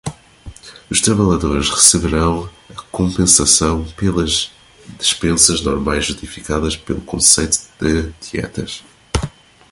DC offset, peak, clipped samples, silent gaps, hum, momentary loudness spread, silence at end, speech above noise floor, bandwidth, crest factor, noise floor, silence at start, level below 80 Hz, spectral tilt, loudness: under 0.1%; 0 dBFS; under 0.1%; none; none; 17 LU; 0.45 s; 21 dB; 16 kHz; 18 dB; -38 dBFS; 0.05 s; -30 dBFS; -3 dB/octave; -15 LUFS